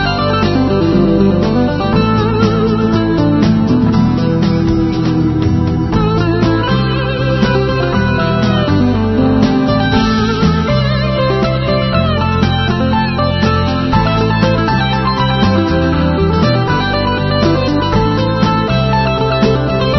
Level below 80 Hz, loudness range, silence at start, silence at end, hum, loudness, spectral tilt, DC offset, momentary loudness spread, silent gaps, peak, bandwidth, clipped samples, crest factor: -26 dBFS; 1 LU; 0 s; 0 s; none; -13 LUFS; -7.5 dB/octave; under 0.1%; 2 LU; none; 0 dBFS; 6.2 kHz; under 0.1%; 12 dB